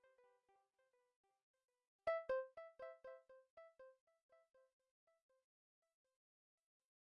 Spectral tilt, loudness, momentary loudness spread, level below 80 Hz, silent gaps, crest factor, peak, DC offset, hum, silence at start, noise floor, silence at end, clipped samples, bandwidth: -1 dB/octave; -48 LUFS; 23 LU; -88 dBFS; 3.50-3.57 s, 4.01-4.07 s, 4.23-4.29 s; 24 dB; -32 dBFS; under 0.1%; none; 2.05 s; -84 dBFS; 2.7 s; under 0.1%; 5.4 kHz